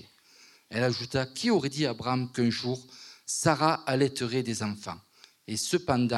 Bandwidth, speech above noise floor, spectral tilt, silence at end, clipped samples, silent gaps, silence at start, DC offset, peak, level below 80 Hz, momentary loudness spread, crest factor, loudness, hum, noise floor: 14.5 kHz; 30 dB; -4.5 dB/octave; 0 s; under 0.1%; none; 0.7 s; under 0.1%; -10 dBFS; -66 dBFS; 12 LU; 20 dB; -29 LUFS; none; -58 dBFS